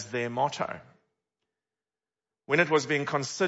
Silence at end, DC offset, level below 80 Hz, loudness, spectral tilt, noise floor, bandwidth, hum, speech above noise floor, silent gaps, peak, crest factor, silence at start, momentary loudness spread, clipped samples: 0 s; under 0.1%; -76 dBFS; -28 LUFS; -4.5 dB/octave; under -90 dBFS; 8 kHz; none; over 62 dB; none; -8 dBFS; 22 dB; 0 s; 11 LU; under 0.1%